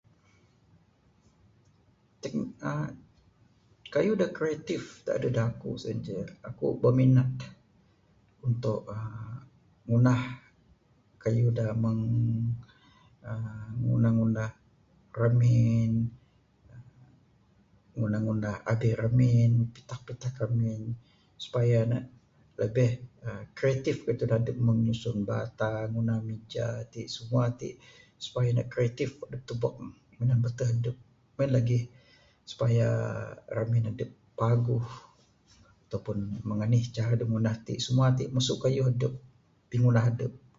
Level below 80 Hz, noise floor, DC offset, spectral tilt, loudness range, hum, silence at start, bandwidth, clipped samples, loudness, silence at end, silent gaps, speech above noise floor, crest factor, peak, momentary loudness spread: -56 dBFS; -65 dBFS; under 0.1%; -7.5 dB/octave; 4 LU; none; 2.25 s; 7.6 kHz; under 0.1%; -29 LUFS; 0.2 s; none; 37 dB; 18 dB; -10 dBFS; 16 LU